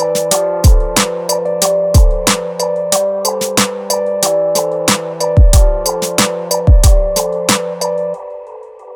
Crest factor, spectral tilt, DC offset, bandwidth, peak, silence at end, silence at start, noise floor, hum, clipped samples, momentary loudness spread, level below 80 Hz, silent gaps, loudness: 12 dB; -4 dB/octave; under 0.1%; over 20 kHz; 0 dBFS; 0 s; 0 s; -32 dBFS; none; under 0.1%; 8 LU; -16 dBFS; none; -13 LUFS